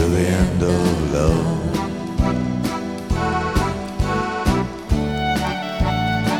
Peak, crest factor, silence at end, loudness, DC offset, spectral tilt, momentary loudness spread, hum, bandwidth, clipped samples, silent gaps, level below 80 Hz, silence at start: -4 dBFS; 16 dB; 0 s; -21 LUFS; 0.2%; -6 dB/octave; 6 LU; none; 18 kHz; under 0.1%; none; -28 dBFS; 0 s